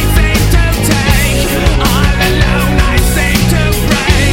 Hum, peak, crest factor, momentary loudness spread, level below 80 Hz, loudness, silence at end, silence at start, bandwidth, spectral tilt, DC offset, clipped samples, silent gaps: none; 0 dBFS; 10 dB; 1 LU; -14 dBFS; -11 LUFS; 0 s; 0 s; 17 kHz; -4.5 dB/octave; under 0.1%; 0.2%; none